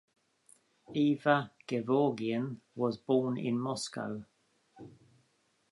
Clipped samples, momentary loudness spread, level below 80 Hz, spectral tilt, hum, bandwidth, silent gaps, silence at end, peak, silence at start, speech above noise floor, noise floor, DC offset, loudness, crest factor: under 0.1%; 11 LU; -78 dBFS; -6 dB/octave; none; 11.5 kHz; none; 0.8 s; -12 dBFS; 0.9 s; 42 dB; -74 dBFS; under 0.1%; -32 LUFS; 22 dB